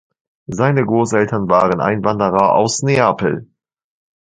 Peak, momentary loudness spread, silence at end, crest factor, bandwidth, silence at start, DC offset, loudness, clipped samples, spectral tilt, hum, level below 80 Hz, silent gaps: 0 dBFS; 6 LU; 0.8 s; 16 dB; 9.6 kHz; 0.5 s; under 0.1%; -15 LUFS; under 0.1%; -5.5 dB/octave; none; -50 dBFS; none